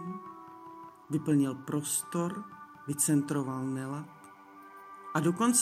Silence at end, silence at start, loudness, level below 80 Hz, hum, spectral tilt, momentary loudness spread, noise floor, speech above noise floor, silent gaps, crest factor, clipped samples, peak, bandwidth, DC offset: 0 s; 0 s; -31 LUFS; -76 dBFS; none; -4.5 dB/octave; 22 LU; -52 dBFS; 22 dB; none; 18 dB; under 0.1%; -14 dBFS; 15.5 kHz; under 0.1%